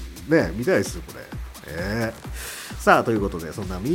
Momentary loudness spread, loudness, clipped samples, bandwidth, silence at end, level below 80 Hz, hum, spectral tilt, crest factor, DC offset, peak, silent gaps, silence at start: 18 LU; -23 LUFS; under 0.1%; 17 kHz; 0 s; -38 dBFS; none; -5.5 dB/octave; 24 dB; under 0.1%; 0 dBFS; none; 0 s